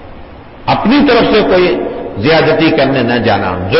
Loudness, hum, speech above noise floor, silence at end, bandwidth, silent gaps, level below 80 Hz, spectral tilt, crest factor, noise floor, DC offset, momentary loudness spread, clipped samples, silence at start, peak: -10 LUFS; none; 22 dB; 0 s; 5.8 kHz; none; -34 dBFS; -10 dB/octave; 10 dB; -31 dBFS; under 0.1%; 8 LU; under 0.1%; 0 s; -2 dBFS